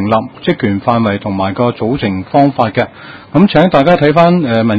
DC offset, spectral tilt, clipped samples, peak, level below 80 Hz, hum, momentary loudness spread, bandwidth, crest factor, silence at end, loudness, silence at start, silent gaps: under 0.1%; -9 dB/octave; 0.5%; 0 dBFS; -40 dBFS; none; 8 LU; 7.4 kHz; 12 dB; 0 s; -12 LUFS; 0 s; none